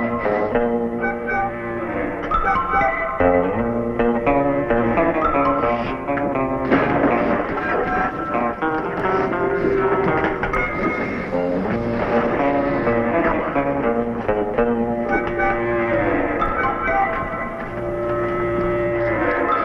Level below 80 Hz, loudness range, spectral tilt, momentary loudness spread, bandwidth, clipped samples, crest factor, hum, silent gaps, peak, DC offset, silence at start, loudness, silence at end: -36 dBFS; 2 LU; -8.5 dB/octave; 5 LU; 7 kHz; under 0.1%; 16 dB; none; none; -4 dBFS; under 0.1%; 0 s; -20 LUFS; 0 s